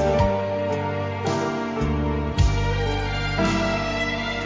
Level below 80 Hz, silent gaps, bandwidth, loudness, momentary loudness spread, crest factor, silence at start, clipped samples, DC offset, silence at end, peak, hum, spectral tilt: -30 dBFS; none; 7.8 kHz; -24 LUFS; 4 LU; 16 dB; 0 s; under 0.1%; under 0.1%; 0 s; -6 dBFS; none; -6 dB/octave